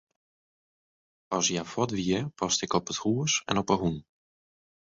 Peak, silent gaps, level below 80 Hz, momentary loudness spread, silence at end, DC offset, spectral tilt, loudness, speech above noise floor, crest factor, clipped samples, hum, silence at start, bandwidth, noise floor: -8 dBFS; none; -58 dBFS; 4 LU; 0.85 s; under 0.1%; -3.5 dB/octave; -28 LUFS; over 62 dB; 22 dB; under 0.1%; none; 1.3 s; 7.8 kHz; under -90 dBFS